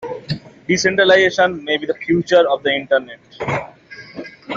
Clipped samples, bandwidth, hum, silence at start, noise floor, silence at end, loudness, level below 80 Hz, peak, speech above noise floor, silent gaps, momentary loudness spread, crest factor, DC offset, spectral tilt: under 0.1%; 7.6 kHz; none; 0 s; -39 dBFS; 0 s; -16 LUFS; -54 dBFS; -2 dBFS; 23 dB; none; 22 LU; 16 dB; under 0.1%; -4 dB/octave